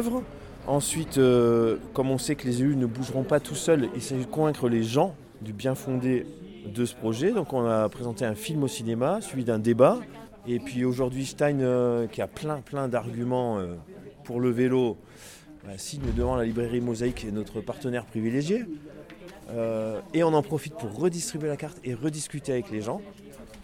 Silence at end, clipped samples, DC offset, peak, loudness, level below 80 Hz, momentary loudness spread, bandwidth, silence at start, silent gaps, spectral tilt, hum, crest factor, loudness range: 0 s; under 0.1%; under 0.1%; -6 dBFS; -27 LUFS; -48 dBFS; 16 LU; 17.5 kHz; 0 s; none; -6 dB/octave; none; 20 dB; 5 LU